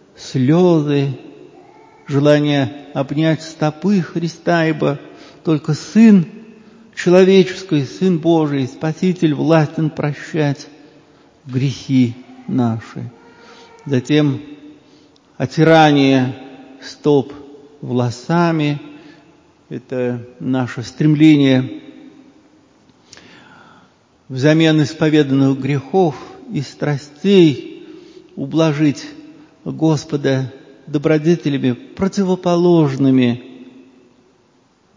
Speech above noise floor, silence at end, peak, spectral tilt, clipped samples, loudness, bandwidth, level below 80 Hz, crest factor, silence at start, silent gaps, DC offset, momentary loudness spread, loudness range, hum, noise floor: 41 dB; 1.25 s; 0 dBFS; -7 dB/octave; under 0.1%; -16 LUFS; 7.6 kHz; -58 dBFS; 16 dB; 0.2 s; none; under 0.1%; 17 LU; 6 LU; none; -55 dBFS